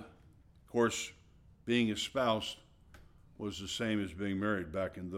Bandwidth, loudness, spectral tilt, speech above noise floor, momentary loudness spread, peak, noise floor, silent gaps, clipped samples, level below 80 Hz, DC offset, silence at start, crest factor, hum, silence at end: 15.5 kHz; -35 LUFS; -4.5 dB/octave; 27 dB; 12 LU; -18 dBFS; -61 dBFS; none; under 0.1%; -62 dBFS; under 0.1%; 0 s; 18 dB; none; 0 s